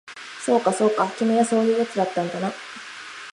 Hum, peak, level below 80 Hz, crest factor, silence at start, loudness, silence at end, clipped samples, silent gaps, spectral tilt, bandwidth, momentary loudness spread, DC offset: none; -6 dBFS; -74 dBFS; 18 dB; 0.05 s; -22 LUFS; 0 s; under 0.1%; none; -5 dB/octave; 11.5 kHz; 16 LU; under 0.1%